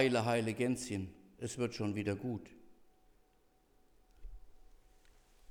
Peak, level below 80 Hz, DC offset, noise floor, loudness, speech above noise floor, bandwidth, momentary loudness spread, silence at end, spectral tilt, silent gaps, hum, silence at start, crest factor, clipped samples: -16 dBFS; -62 dBFS; under 0.1%; -70 dBFS; -37 LUFS; 35 dB; 17.5 kHz; 26 LU; 0.95 s; -5.5 dB/octave; none; none; 0 s; 24 dB; under 0.1%